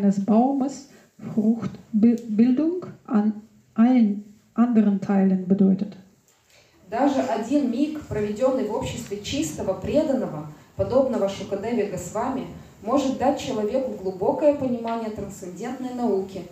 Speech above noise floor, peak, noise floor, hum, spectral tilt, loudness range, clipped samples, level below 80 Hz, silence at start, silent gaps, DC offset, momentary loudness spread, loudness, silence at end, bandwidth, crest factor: 35 dB; -6 dBFS; -58 dBFS; none; -7 dB/octave; 4 LU; under 0.1%; -54 dBFS; 0 s; none; under 0.1%; 12 LU; -23 LUFS; 0 s; 14.5 kHz; 16 dB